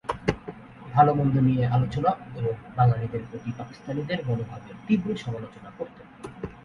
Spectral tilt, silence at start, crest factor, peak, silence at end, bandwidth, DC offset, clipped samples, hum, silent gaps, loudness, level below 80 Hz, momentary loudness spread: -8.5 dB/octave; 0.05 s; 20 dB; -6 dBFS; 0.05 s; 7.2 kHz; under 0.1%; under 0.1%; none; none; -26 LUFS; -50 dBFS; 18 LU